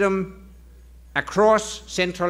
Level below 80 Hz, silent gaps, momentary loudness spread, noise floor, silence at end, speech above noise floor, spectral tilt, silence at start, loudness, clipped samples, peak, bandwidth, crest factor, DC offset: -46 dBFS; none; 11 LU; -46 dBFS; 0 s; 25 dB; -4.5 dB/octave; 0 s; -22 LUFS; under 0.1%; -6 dBFS; 15.5 kHz; 18 dB; under 0.1%